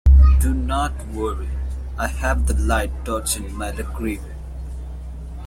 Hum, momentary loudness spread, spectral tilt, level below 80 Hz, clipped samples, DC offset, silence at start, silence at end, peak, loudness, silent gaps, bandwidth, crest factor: none; 16 LU; -5.5 dB/octave; -20 dBFS; under 0.1%; under 0.1%; 0.05 s; 0 s; -4 dBFS; -22 LUFS; none; 15 kHz; 16 dB